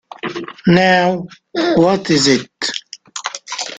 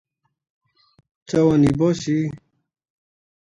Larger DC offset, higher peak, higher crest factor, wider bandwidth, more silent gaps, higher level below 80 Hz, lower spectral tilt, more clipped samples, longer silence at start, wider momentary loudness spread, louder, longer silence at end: neither; first, 0 dBFS vs -6 dBFS; about the same, 16 dB vs 16 dB; second, 9.4 kHz vs 11 kHz; neither; about the same, -52 dBFS vs -50 dBFS; second, -4.5 dB/octave vs -7.5 dB/octave; neither; second, 0.25 s vs 1.3 s; first, 14 LU vs 8 LU; first, -16 LUFS vs -19 LUFS; second, 0 s vs 1.05 s